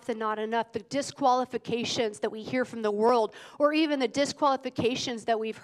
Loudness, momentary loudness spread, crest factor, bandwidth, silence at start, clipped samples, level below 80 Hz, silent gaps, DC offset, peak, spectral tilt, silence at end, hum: -28 LUFS; 7 LU; 18 dB; 12.5 kHz; 0.05 s; under 0.1%; -70 dBFS; none; under 0.1%; -10 dBFS; -4 dB/octave; 0.05 s; none